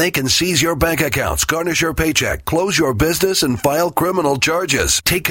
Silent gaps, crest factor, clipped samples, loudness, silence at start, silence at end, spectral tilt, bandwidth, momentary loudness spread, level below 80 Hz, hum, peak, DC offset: none; 16 dB; under 0.1%; -16 LUFS; 0 s; 0 s; -3 dB/octave; 16.5 kHz; 3 LU; -32 dBFS; none; 0 dBFS; under 0.1%